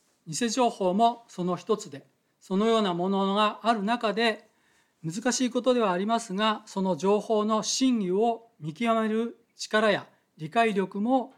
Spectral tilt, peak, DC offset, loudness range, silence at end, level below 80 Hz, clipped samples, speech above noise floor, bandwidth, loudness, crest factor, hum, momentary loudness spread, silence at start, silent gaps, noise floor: -4.5 dB/octave; -10 dBFS; under 0.1%; 1 LU; 0.1 s; -78 dBFS; under 0.1%; 41 dB; 14 kHz; -26 LUFS; 16 dB; none; 9 LU; 0.25 s; none; -67 dBFS